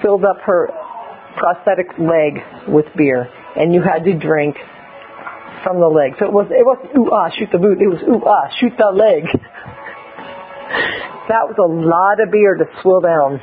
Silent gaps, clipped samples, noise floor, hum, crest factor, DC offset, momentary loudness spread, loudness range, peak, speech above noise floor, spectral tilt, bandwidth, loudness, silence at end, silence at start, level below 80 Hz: none; under 0.1%; -35 dBFS; none; 14 dB; under 0.1%; 19 LU; 3 LU; 0 dBFS; 22 dB; -12 dB/octave; 5 kHz; -14 LUFS; 0 s; 0 s; -54 dBFS